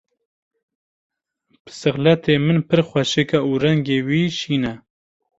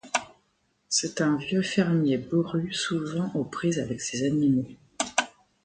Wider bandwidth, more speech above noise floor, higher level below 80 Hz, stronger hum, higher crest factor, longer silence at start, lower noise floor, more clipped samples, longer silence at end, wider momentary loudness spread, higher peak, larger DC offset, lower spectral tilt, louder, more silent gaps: second, 8 kHz vs 9.6 kHz; about the same, 47 dB vs 45 dB; first, -54 dBFS vs -62 dBFS; neither; about the same, 18 dB vs 20 dB; first, 1.65 s vs 0.05 s; second, -65 dBFS vs -71 dBFS; neither; first, 0.6 s vs 0.35 s; about the same, 6 LU vs 7 LU; first, -2 dBFS vs -8 dBFS; neither; first, -6 dB/octave vs -4.5 dB/octave; first, -19 LUFS vs -27 LUFS; neither